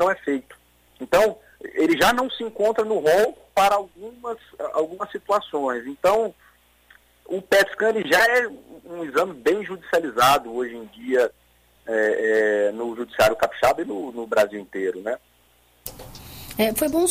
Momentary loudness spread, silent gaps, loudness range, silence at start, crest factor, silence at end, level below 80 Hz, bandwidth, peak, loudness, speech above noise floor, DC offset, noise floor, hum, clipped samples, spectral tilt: 16 LU; none; 5 LU; 0 s; 16 dB; 0 s; -54 dBFS; 16 kHz; -6 dBFS; -22 LUFS; 37 dB; under 0.1%; -59 dBFS; 60 Hz at -60 dBFS; under 0.1%; -3.5 dB/octave